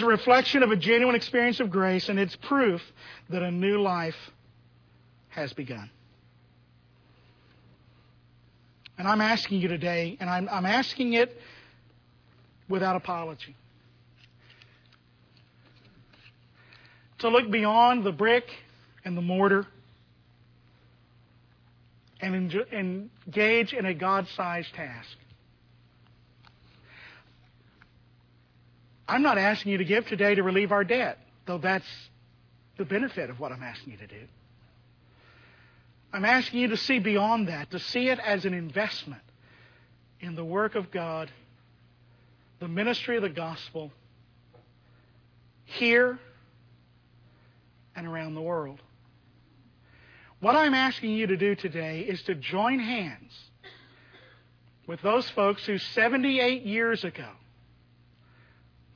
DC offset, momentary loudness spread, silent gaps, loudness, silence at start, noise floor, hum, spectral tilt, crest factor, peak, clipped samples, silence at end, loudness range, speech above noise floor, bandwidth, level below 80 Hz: under 0.1%; 19 LU; none; -26 LUFS; 0 s; -60 dBFS; 60 Hz at -55 dBFS; -6 dB/octave; 22 dB; -6 dBFS; under 0.1%; 1.6 s; 11 LU; 34 dB; 5.4 kHz; -68 dBFS